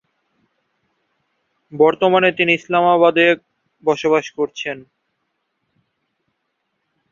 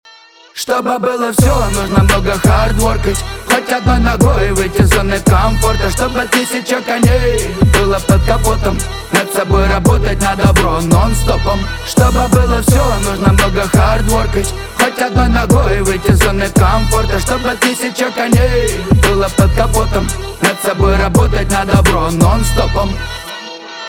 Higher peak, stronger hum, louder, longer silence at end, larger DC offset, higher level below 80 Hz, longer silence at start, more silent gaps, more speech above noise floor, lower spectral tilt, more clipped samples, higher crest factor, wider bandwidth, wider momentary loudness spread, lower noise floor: about the same, 0 dBFS vs 0 dBFS; neither; second, -16 LUFS vs -13 LUFS; first, 2.3 s vs 0 s; neither; second, -66 dBFS vs -18 dBFS; first, 1.75 s vs 0.55 s; neither; first, 57 dB vs 29 dB; about the same, -5.5 dB/octave vs -5 dB/octave; neither; first, 18 dB vs 12 dB; second, 7.4 kHz vs 19 kHz; first, 13 LU vs 5 LU; first, -73 dBFS vs -41 dBFS